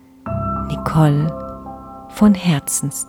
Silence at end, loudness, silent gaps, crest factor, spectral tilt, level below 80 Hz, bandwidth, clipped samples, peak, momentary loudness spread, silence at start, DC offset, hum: 0.05 s; -17 LUFS; none; 16 dB; -6 dB/octave; -38 dBFS; 18 kHz; under 0.1%; -2 dBFS; 19 LU; 0.25 s; under 0.1%; none